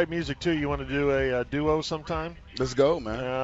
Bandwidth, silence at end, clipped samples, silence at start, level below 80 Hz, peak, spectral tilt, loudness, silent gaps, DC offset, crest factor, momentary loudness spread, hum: 8 kHz; 0 s; under 0.1%; 0 s; -44 dBFS; -10 dBFS; -6 dB/octave; -27 LUFS; none; under 0.1%; 16 dB; 8 LU; none